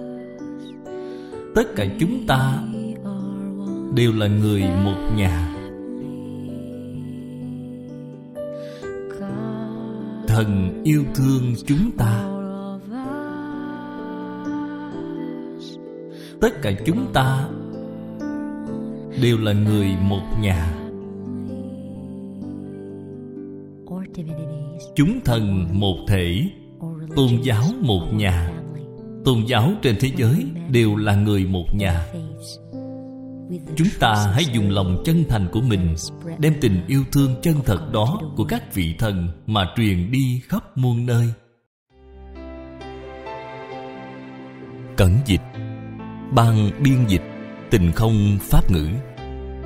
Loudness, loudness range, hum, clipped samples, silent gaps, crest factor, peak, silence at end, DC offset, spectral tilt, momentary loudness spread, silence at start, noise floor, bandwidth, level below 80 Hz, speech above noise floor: -21 LUFS; 11 LU; none; under 0.1%; 41.66-41.86 s; 20 dB; -2 dBFS; 0 s; under 0.1%; -6.5 dB/octave; 16 LU; 0 s; -42 dBFS; 16.5 kHz; -34 dBFS; 23 dB